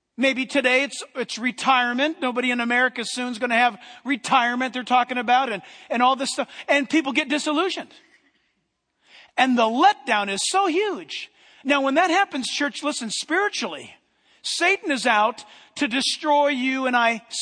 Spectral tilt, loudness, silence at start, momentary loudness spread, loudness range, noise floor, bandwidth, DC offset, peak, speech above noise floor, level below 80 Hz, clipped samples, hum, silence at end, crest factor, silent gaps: -2 dB/octave; -21 LUFS; 0.2 s; 11 LU; 2 LU; -74 dBFS; 10.5 kHz; under 0.1%; -4 dBFS; 52 dB; -78 dBFS; under 0.1%; none; 0 s; 20 dB; none